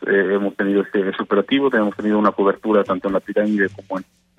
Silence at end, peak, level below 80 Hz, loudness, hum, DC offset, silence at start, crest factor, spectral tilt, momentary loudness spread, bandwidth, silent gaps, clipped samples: 0.35 s; -4 dBFS; -60 dBFS; -19 LUFS; none; under 0.1%; 0 s; 16 dB; -7.5 dB/octave; 5 LU; 7.2 kHz; none; under 0.1%